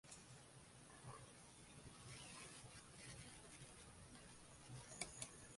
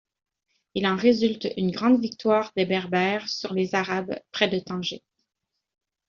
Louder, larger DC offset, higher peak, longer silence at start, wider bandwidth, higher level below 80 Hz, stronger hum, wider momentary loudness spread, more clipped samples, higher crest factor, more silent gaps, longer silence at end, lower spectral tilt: second, -58 LUFS vs -25 LUFS; neither; second, -28 dBFS vs -6 dBFS; second, 0.05 s vs 0.75 s; first, 11.5 kHz vs 7.2 kHz; second, -74 dBFS vs -64 dBFS; neither; about the same, 10 LU vs 9 LU; neither; first, 32 dB vs 20 dB; neither; second, 0 s vs 1.1 s; about the same, -3 dB/octave vs -4 dB/octave